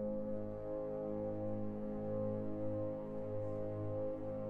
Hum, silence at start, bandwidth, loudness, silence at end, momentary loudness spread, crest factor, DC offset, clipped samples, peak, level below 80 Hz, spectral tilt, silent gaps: none; 0 s; 4.2 kHz; -42 LUFS; 0 s; 3 LU; 12 dB; under 0.1%; under 0.1%; -28 dBFS; -58 dBFS; -11 dB/octave; none